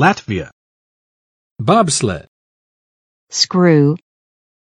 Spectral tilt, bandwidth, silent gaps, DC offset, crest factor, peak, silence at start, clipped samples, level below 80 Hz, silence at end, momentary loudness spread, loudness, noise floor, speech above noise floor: -4.5 dB/octave; 10.5 kHz; 0.52-1.56 s, 2.28-3.27 s; under 0.1%; 18 dB; 0 dBFS; 0 s; under 0.1%; -50 dBFS; 0.85 s; 14 LU; -15 LUFS; under -90 dBFS; over 76 dB